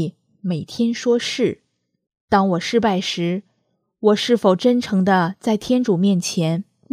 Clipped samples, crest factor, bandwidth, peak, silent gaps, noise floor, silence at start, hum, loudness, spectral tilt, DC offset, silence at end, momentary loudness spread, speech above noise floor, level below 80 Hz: under 0.1%; 18 dB; 14 kHz; -2 dBFS; 2.21-2.28 s; -69 dBFS; 0 s; none; -19 LUFS; -5.5 dB/octave; under 0.1%; 0.3 s; 10 LU; 51 dB; -58 dBFS